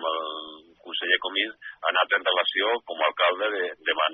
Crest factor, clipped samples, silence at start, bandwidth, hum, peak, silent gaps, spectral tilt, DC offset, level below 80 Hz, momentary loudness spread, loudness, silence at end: 20 dB; under 0.1%; 0 s; 5 kHz; none; -6 dBFS; none; 4 dB/octave; under 0.1%; -78 dBFS; 9 LU; -25 LUFS; 0 s